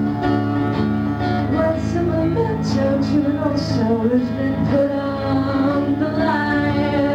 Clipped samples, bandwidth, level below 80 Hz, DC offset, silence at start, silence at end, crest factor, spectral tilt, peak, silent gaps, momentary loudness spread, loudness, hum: under 0.1%; 8.2 kHz; -38 dBFS; under 0.1%; 0 s; 0 s; 12 dB; -8 dB/octave; -6 dBFS; none; 2 LU; -19 LUFS; none